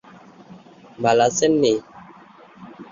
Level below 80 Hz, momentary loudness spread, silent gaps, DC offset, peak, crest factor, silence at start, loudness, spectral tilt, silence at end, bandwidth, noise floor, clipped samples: -62 dBFS; 9 LU; none; under 0.1%; -4 dBFS; 18 dB; 0.5 s; -19 LUFS; -4 dB/octave; 0.05 s; 7.6 kHz; -47 dBFS; under 0.1%